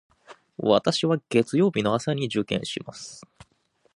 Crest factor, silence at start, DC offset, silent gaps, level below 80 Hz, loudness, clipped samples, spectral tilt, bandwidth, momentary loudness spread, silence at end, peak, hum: 22 dB; 0.3 s; under 0.1%; none; -62 dBFS; -24 LUFS; under 0.1%; -5.5 dB/octave; 11.5 kHz; 19 LU; 0.75 s; -4 dBFS; none